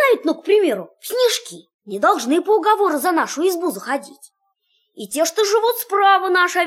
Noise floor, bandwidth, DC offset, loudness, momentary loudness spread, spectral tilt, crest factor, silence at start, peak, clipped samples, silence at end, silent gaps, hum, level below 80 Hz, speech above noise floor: -67 dBFS; 16.5 kHz; under 0.1%; -18 LUFS; 11 LU; -2 dB/octave; 14 dB; 0 s; -4 dBFS; under 0.1%; 0 s; 1.74-1.79 s; none; -74 dBFS; 49 dB